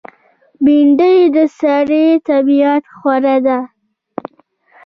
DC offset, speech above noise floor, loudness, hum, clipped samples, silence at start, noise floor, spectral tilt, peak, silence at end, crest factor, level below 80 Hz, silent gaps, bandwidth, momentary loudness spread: under 0.1%; 41 dB; -12 LUFS; none; under 0.1%; 0.6 s; -52 dBFS; -6.5 dB/octave; -2 dBFS; 1.2 s; 10 dB; -58 dBFS; none; 6 kHz; 20 LU